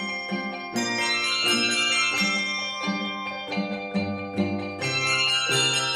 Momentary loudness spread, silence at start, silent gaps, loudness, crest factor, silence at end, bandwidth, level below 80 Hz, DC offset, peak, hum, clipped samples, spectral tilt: 9 LU; 0 s; none; -24 LUFS; 14 dB; 0 s; 15 kHz; -66 dBFS; under 0.1%; -12 dBFS; none; under 0.1%; -2 dB/octave